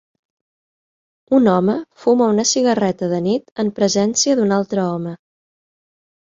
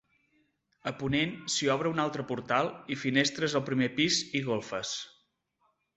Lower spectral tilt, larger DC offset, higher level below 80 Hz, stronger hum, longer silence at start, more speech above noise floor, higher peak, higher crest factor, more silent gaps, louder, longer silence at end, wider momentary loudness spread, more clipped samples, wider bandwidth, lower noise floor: about the same, -4.5 dB/octave vs -4 dB/octave; neither; about the same, -60 dBFS vs -64 dBFS; neither; first, 1.3 s vs 0.85 s; first, over 73 dB vs 45 dB; first, -2 dBFS vs -10 dBFS; second, 16 dB vs 22 dB; first, 3.52-3.56 s vs none; first, -17 LUFS vs -30 LUFS; first, 1.25 s vs 0.9 s; about the same, 7 LU vs 9 LU; neither; second, 7.6 kHz vs 8.4 kHz; first, under -90 dBFS vs -75 dBFS